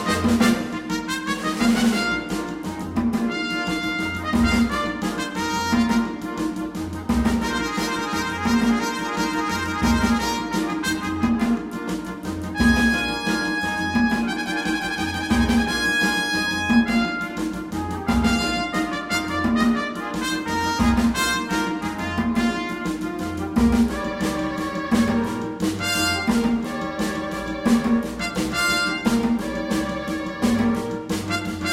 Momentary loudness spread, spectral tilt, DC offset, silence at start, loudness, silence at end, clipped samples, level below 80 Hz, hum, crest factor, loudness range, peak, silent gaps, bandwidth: 8 LU; -4.5 dB/octave; under 0.1%; 0 s; -22 LUFS; 0 s; under 0.1%; -38 dBFS; none; 16 dB; 2 LU; -6 dBFS; none; 16.5 kHz